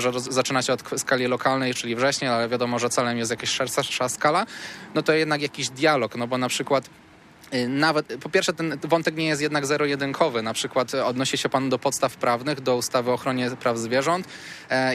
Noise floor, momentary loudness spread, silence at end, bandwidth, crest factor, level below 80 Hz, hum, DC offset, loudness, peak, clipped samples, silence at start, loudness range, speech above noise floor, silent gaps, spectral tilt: -49 dBFS; 4 LU; 0 s; 15.5 kHz; 18 dB; -66 dBFS; none; under 0.1%; -24 LUFS; -6 dBFS; under 0.1%; 0 s; 1 LU; 26 dB; none; -3.5 dB/octave